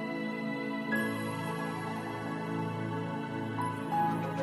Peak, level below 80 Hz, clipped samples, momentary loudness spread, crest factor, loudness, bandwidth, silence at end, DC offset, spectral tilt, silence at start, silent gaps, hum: -18 dBFS; -70 dBFS; under 0.1%; 5 LU; 16 dB; -34 LUFS; 13 kHz; 0 s; under 0.1%; -6.5 dB/octave; 0 s; none; none